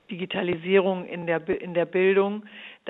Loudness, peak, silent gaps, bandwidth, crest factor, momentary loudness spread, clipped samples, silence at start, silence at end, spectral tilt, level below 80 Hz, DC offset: -25 LUFS; -8 dBFS; none; 4 kHz; 16 dB; 9 LU; under 0.1%; 0.1 s; 0 s; -9 dB/octave; -64 dBFS; under 0.1%